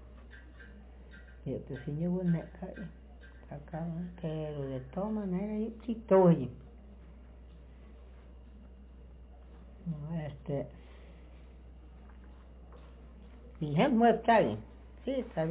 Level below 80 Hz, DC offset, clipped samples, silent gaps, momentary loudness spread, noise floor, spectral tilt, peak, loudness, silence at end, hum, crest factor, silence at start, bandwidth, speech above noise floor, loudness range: -52 dBFS; under 0.1%; under 0.1%; none; 28 LU; -52 dBFS; -7 dB/octave; -14 dBFS; -32 LUFS; 0 s; none; 20 dB; 0 s; 4 kHz; 21 dB; 15 LU